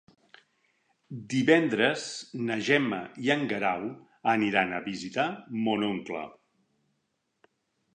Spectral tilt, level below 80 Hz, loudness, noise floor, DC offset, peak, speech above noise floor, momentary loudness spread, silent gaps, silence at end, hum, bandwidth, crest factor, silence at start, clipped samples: -5 dB/octave; -72 dBFS; -28 LUFS; -78 dBFS; under 0.1%; -8 dBFS; 50 dB; 14 LU; none; 1.6 s; none; 9.8 kHz; 22 dB; 1.1 s; under 0.1%